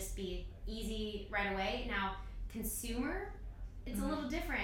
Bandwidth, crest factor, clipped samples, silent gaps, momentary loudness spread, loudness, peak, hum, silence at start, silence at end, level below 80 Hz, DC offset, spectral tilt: 17.5 kHz; 16 dB; under 0.1%; none; 10 LU; -40 LUFS; -24 dBFS; none; 0 s; 0 s; -46 dBFS; under 0.1%; -4 dB/octave